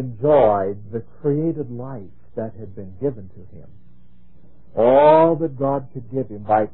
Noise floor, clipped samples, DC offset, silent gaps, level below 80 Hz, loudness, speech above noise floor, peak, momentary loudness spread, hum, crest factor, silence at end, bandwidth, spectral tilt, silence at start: -52 dBFS; under 0.1%; 1%; none; -52 dBFS; -19 LUFS; 33 dB; -2 dBFS; 21 LU; none; 18 dB; 0.05 s; 4.2 kHz; -12 dB/octave; 0 s